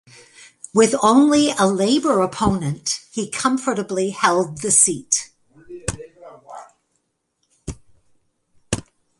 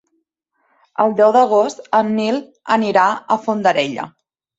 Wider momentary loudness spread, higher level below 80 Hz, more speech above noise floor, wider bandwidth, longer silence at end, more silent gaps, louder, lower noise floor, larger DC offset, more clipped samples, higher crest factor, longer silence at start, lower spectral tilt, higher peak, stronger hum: first, 23 LU vs 11 LU; first, -46 dBFS vs -66 dBFS; about the same, 54 dB vs 53 dB; first, 11.5 kHz vs 8 kHz; about the same, 0.4 s vs 0.5 s; neither; about the same, -18 LUFS vs -16 LUFS; about the same, -71 dBFS vs -69 dBFS; neither; neither; about the same, 20 dB vs 16 dB; second, 0.4 s vs 1 s; second, -3.5 dB/octave vs -5 dB/octave; about the same, 0 dBFS vs -2 dBFS; neither